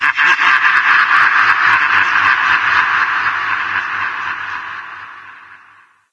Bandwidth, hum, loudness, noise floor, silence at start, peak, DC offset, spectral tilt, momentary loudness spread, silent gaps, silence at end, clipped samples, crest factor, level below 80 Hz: 11 kHz; none; -12 LUFS; -47 dBFS; 0 s; 0 dBFS; under 0.1%; -1 dB/octave; 15 LU; none; 0.55 s; under 0.1%; 14 dB; -58 dBFS